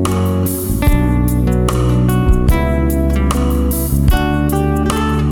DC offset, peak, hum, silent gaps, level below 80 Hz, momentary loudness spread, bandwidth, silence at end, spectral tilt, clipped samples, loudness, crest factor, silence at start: under 0.1%; 0 dBFS; none; none; -18 dBFS; 2 LU; 19 kHz; 0 s; -6.5 dB/octave; under 0.1%; -15 LUFS; 12 dB; 0 s